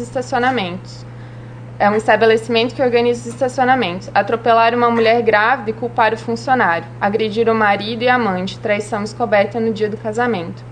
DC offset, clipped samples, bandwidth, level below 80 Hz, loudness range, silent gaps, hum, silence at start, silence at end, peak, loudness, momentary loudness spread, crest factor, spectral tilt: under 0.1%; under 0.1%; 10 kHz; -48 dBFS; 2 LU; none; 60 Hz at -35 dBFS; 0 s; 0 s; 0 dBFS; -16 LUFS; 10 LU; 16 dB; -5.5 dB/octave